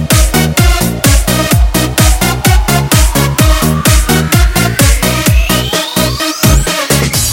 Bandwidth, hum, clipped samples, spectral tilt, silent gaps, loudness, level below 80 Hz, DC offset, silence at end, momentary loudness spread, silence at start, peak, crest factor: 17.5 kHz; none; 0.4%; -4 dB/octave; none; -9 LUFS; -14 dBFS; under 0.1%; 0 s; 2 LU; 0 s; 0 dBFS; 8 dB